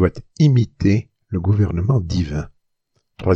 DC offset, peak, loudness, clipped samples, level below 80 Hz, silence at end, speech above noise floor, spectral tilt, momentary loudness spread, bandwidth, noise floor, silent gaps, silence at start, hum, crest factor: under 0.1%; -2 dBFS; -19 LUFS; under 0.1%; -38 dBFS; 0 s; 51 dB; -8.5 dB/octave; 11 LU; 7.4 kHz; -69 dBFS; none; 0 s; none; 16 dB